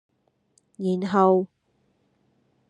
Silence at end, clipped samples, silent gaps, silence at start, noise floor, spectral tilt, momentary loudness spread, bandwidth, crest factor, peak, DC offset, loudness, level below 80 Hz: 1.25 s; under 0.1%; none; 0.8 s; -69 dBFS; -8.5 dB/octave; 12 LU; 9 kHz; 22 dB; -6 dBFS; under 0.1%; -22 LUFS; -74 dBFS